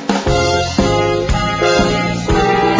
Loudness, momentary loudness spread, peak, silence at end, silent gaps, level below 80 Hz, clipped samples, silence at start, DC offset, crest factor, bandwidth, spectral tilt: -14 LUFS; 3 LU; 0 dBFS; 0 s; none; -26 dBFS; under 0.1%; 0 s; under 0.1%; 14 dB; 8 kHz; -5 dB/octave